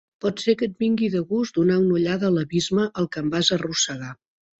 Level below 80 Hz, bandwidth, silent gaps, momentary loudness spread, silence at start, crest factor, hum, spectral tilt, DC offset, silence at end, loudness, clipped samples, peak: -58 dBFS; 8.2 kHz; none; 5 LU; 0.25 s; 18 dB; none; -4.5 dB/octave; under 0.1%; 0.45 s; -22 LUFS; under 0.1%; -4 dBFS